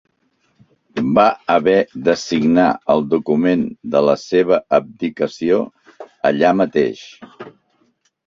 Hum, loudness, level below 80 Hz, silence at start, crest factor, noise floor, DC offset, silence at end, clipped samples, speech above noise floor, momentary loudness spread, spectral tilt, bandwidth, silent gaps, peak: none; -16 LUFS; -56 dBFS; 0.95 s; 16 dB; -64 dBFS; under 0.1%; 0.8 s; under 0.1%; 48 dB; 8 LU; -6 dB/octave; 7.6 kHz; none; -2 dBFS